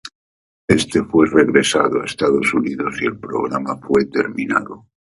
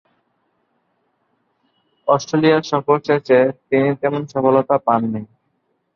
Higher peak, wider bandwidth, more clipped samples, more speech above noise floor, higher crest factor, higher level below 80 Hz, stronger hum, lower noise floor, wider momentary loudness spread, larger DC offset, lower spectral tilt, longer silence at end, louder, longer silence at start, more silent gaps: about the same, 0 dBFS vs -2 dBFS; first, 11.5 kHz vs 7 kHz; neither; first, over 73 dB vs 52 dB; about the same, 18 dB vs 18 dB; first, -48 dBFS vs -62 dBFS; neither; first, under -90 dBFS vs -68 dBFS; first, 10 LU vs 6 LU; neither; second, -4.5 dB/octave vs -6.5 dB/octave; second, 0.3 s vs 0.7 s; about the same, -17 LUFS vs -17 LUFS; second, 0.05 s vs 2.05 s; first, 0.15-0.68 s vs none